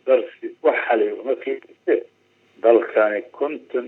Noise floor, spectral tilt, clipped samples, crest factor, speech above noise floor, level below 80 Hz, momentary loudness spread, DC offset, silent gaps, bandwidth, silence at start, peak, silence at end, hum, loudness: -56 dBFS; -6.5 dB/octave; under 0.1%; 20 dB; 35 dB; under -90 dBFS; 10 LU; under 0.1%; none; 4.1 kHz; 0.05 s; -2 dBFS; 0 s; none; -21 LUFS